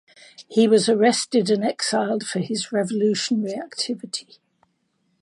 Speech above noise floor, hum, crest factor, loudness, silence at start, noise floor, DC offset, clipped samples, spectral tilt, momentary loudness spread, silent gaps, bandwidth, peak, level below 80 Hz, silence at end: 48 dB; none; 18 dB; -22 LUFS; 0.4 s; -69 dBFS; under 0.1%; under 0.1%; -4 dB/octave; 10 LU; none; 11 kHz; -4 dBFS; -74 dBFS; 1 s